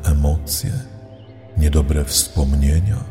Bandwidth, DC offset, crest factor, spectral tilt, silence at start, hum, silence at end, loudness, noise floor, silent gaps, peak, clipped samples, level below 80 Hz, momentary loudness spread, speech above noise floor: 16.5 kHz; under 0.1%; 16 dB; -5 dB/octave; 0 s; none; 0 s; -19 LUFS; -39 dBFS; none; -2 dBFS; under 0.1%; -20 dBFS; 11 LU; 22 dB